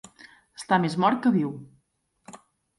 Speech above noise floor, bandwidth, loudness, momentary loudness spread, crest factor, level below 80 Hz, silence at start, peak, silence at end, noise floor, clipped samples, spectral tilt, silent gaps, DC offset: 47 dB; 11.5 kHz; -24 LUFS; 21 LU; 20 dB; -70 dBFS; 0.6 s; -8 dBFS; 0.45 s; -71 dBFS; under 0.1%; -6.5 dB/octave; none; under 0.1%